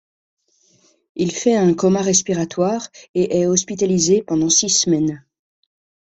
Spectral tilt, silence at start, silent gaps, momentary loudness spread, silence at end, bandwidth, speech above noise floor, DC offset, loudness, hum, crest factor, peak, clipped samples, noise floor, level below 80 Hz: -4 dB/octave; 1.15 s; 3.09-3.14 s; 9 LU; 0.95 s; 8.4 kHz; 41 dB; under 0.1%; -17 LUFS; none; 18 dB; -2 dBFS; under 0.1%; -58 dBFS; -56 dBFS